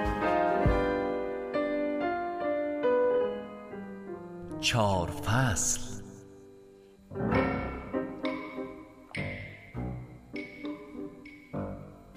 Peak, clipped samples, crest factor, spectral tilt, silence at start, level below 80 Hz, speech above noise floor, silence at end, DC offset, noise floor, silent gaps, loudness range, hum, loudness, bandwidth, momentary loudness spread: -14 dBFS; under 0.1%; 18 dB; -4.5 dB/octave; 0 s; -46 dBFS; 27 dB; 0 s; under 0.1%; -55 dBFS; none; 10 LU; none; -31 LUFS; 15.5 kHz; 16 LU